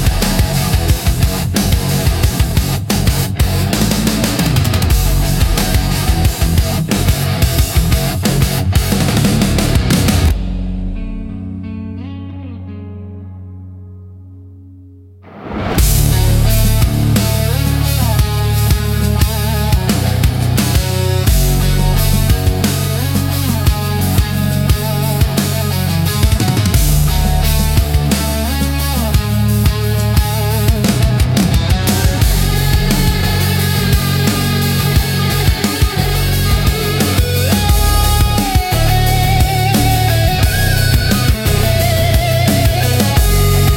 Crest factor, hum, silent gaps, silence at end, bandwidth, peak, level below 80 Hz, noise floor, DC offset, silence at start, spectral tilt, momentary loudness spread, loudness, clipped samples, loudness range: 12 dB; none; none; 0 s; 17 kHz; 0 dBFS; -18 dBFS; -38 dBFS; under 0.1%; 0 s; -5 dB/octave; 4 LU; -14 LUFS; under 0.1%; 5 LU